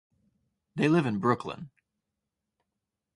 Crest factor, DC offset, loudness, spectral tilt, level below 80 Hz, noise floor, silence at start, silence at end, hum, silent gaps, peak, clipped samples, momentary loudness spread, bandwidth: 24 dB; under 0.1%; -27 LUFS; -7.5 dB/octave; -68 dBFS; -86 dBFS; 0.75 s; 1.5 s; none; none; -8 dBFS; under 0.1%; 17 LU; 11.5 kHz